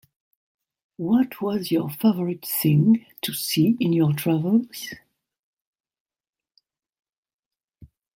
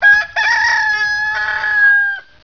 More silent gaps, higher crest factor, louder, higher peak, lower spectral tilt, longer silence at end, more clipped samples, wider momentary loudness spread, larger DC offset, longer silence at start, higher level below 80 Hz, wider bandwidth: first, 5.39-5.73 s, 6.00-6.06 s, 6.29-6.33 s, 6.89-6.93 s, 7.09-7.23 s, 7.34-7.39 s, 7.46-7.51 s, 7.64-7.68 s vs none; about the same, 16 dB vs 12 dB; second, -22 LUFS vs -12 LUFS; second, -8 dBFS vs -2 dBFS; first, -6 dB/octave vs 0.5 dB/octave; about the same, 0.3 s vs 0.25 s; neither; first, 13 LU vs 6 LU; second, under 0.1% vs 0.4%; first, 1 s vs 0 s; second, -64 dBFS vs -50 dBFS; first, 16.5 kHz vs 5.4 kHz